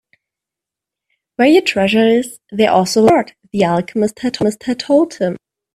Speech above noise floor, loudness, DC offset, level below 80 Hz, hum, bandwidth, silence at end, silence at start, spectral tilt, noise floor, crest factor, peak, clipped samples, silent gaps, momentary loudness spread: 71 dB; -15 LUFS; under 0.1%; -56 dBFS; none; 14 kHz; 0.4 s; 1.4 s; -5 dB/octave; -85 dBFS; 16 dB; 0 dBFS; under 0.1%; none; 10 LU